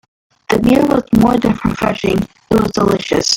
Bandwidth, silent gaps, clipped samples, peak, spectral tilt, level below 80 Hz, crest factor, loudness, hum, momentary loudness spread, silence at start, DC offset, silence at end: 17 kHz; none; under 0.1%; 0 dBFS; -5 dB/octave; -36 dBFS; 14 dB; -14 LUFS; none; 6 LU; 0.5 s; under 0.1%; 0 s